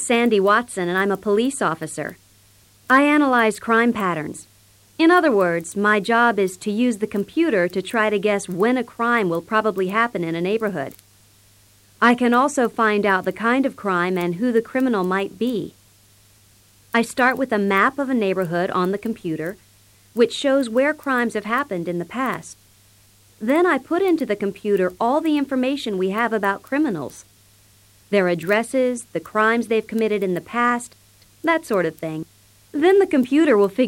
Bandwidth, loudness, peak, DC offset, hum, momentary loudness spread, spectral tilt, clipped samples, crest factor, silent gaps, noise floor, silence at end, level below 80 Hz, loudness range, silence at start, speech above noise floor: 16.5 kHz; -20 LUFS; -4 dBFS; under 0.1%; none; 10 LU; -5 dB/octave; under 0.1%; 18 dB; none; -54 dBFS; 0 s; -62 dBFS; 4 LU; 0 s; 34 dB